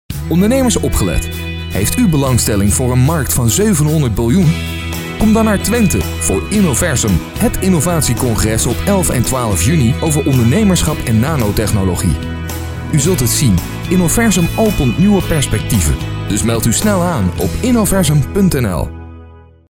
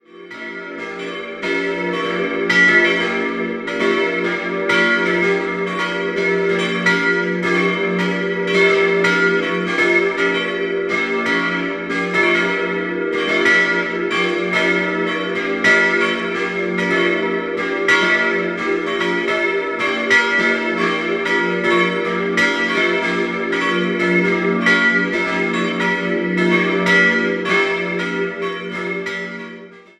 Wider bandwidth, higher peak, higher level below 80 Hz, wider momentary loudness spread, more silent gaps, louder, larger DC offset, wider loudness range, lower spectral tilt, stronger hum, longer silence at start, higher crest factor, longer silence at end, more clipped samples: first, over 20 kHz vs 11 kHz; about the same, -2 dBFS vs -2 dBFS; first, -24 dBFS vs -58 dBFS; about the same, 6 LU vs 8 LU; neither; first, -13 LUFS vs -17 LUFS; neither; about the same, 1 LU vs 2 LU; about the same, -5 dB/octave vs -5 dB/octave; neither; about the same, 0.1 s vs 0.15 s; about the same, 12 dB vs 16 dB; first, 0.35 s vs 0.2 s; neither